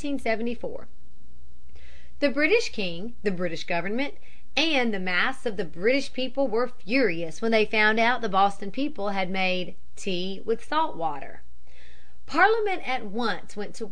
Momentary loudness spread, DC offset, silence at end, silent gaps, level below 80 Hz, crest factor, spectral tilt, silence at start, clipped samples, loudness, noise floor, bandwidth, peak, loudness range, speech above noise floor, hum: 11 LU; 5%; 0 s; none; -54 dBFS; 22 dB; -4.5 dB/octave; 0 s; under 0.1%; -26 LUFS; -53 dBFS; 11 kHz; -6 dBFS; 5 LU; 27 dB; none